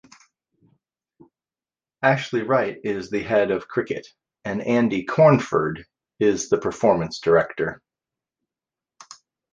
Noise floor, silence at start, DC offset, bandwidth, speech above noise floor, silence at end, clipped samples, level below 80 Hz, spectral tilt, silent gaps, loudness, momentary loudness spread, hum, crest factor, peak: under -90 dBFS; 2 s; under 0.1%; 9.8 kHz; over 69 dB; 1.75 s; under 0.1%; -58 dBFS; -6 dB/octave; none; -22 LUFS; 12 LU; none; 20 dB; -2 dBFS